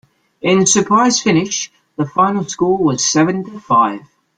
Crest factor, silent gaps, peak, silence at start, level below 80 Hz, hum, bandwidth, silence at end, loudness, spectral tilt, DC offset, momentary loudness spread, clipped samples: 14 dB; none; -2 dBFS; 0.45 s; -54 dBFS; none; 10 kHz; 0.4 s; -15 LUFS; -4 dB/octave; under 0.1%; 11 LU; under 0.1%